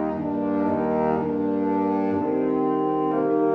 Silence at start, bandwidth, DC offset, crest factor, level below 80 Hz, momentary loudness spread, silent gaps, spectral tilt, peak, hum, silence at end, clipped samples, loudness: 0 s; 4.8 kHz; under 0.1%; 12 dB; -56 dBFS; 2 LU; none; -10 dB/octave; -10 dBFS; none; 0 s; under 0.1%; -23 LUFS